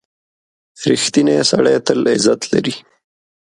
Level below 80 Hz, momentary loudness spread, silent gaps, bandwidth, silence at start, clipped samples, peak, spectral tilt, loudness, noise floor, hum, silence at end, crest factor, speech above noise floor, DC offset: -58 dBFS; 9 LU; none; 11.5 kHz; 0.8 s; under 0.1%; 0 dBFS; -4 dB/octave; -15 LUFS; under -90 dBFS; none; 0.65 s; 16 dB; over 76 dB; under 0.1%